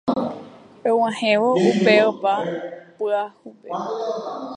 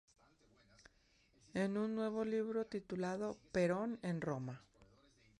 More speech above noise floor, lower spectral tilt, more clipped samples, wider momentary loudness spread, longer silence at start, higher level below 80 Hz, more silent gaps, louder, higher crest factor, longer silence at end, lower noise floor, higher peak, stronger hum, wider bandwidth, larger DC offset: second, 21 dB vs 33 dB; second, -5.5 dB/octave vs -7 dB/octave; neither; first, 16 LU vs 8 LU; second, 0.05 s vs 1.55 s; about the same, -68 dBFS vs -72 dBFS; neither; first, -21 LUFS vs -41 LUFS; about the same, 20 dB vs 18 dB; second, 0 s vs 0.55 s; second, -41 dBFS vs -73 dBFS; first, -2 dBFS vs -24 dBFS; neither; second, 10 kHz vs 11.5 kHz; neither